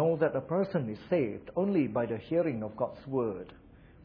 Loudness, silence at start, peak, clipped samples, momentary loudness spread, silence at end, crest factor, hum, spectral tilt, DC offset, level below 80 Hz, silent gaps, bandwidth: -32 LUFS; 0 s; -14 dBFS; under 0.1%; 7 LU; 0 s; 16 dB; none; -7.5 dB/octave; under 0.1%; -62 dBFS; none; 5.4 kHz